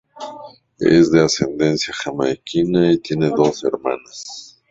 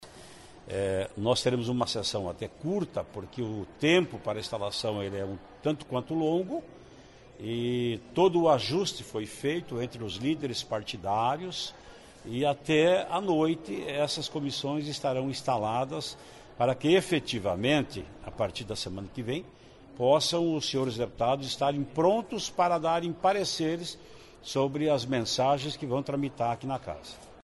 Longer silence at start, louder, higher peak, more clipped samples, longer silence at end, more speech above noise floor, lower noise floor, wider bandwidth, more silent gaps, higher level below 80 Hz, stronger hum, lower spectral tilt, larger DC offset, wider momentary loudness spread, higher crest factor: first, 0.15 s vs 0 s; first, -17 LUFS vs -30 LUFS; first, 0 dBFS vs -12 dBFS; neither; first, 0.25 s vs 0 s; about the same, 22 dB vs 23 dB; second, -39 dBFS vs -52 dBFS; second, 7.8 kHz vs 11.5 kHz; neither; first, -50 dBFS vs -58 dBFS; neither; about the same, -5.5 dB/octave vs -5 dB/octave; neither; first, 19 LU vs 12 LU; about the same, 18 dB vs 18 dB